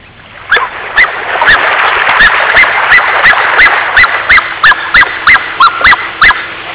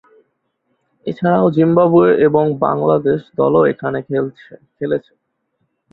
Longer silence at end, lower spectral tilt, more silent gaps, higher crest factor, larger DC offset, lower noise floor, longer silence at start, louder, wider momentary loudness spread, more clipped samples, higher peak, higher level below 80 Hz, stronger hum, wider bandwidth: second, 0 s vs 0.95 s; second, -4.5 dB/octave vs -11 dB/octave; neither; second, 8 dB vs 14 dB; neither; second, -30 dBFS vs -69 dBFS; second, 0.3 s vs 1.05 s; first, -5 LUFS vs -15 LUFS; second, 5 LU vs 12 LU; neither; about the same, 0 dBFS vs -2 dBFS; first, -34 dBFS vs -56 dBFS; neither; second, 4 kHz vs 4.6 kHz